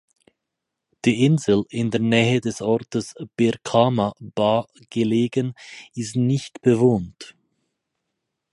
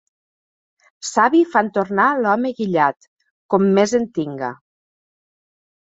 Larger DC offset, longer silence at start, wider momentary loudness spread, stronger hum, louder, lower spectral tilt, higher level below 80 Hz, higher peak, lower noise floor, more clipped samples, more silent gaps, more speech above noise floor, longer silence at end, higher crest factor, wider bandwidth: neither; about the same, 1.05 s vs 1.05 s; about the same, 13 LU vs 12 LU; neither; second, -21 LUFS vs -18 LUFS; about the same, -6.5 dB/octave vs -5.5 dB/octave; first, -56 dBFS vs -62 dBFS; about the same, -2 dBFS vs -2 dBFS; second, -82 dBFS vs under -90 dBFS; neither; second, none vs 3.08-3.17 s, 3.31-3.49 s; second, 61 dB vs over 73 dB; second, 1.25 s vs 1.4 s; about the same, 20 dB vs 18 dB; first, 11.5 kHz vs 8 kHz